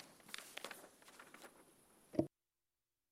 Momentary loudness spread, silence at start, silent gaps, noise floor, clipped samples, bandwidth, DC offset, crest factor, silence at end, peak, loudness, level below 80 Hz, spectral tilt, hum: 23 LU; 0 s; none; under -90 dBFS; under 0.1%; 16 kHz; under 0.1%; 30 dB; 0.85 s; -20 dBFS; -48 LUFS; -80 dBFS; -4.5 dB/octave; none